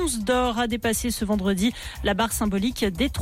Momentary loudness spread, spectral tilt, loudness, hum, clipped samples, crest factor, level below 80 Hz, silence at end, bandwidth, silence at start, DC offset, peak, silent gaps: 3 LU; -4 dB/octave; -24 LUFS; none; under 0.1%; 12 dB; -38 dBFS; 0 s; 16.5 kHz; 0 s; under 0.1%; -12 dBFS; none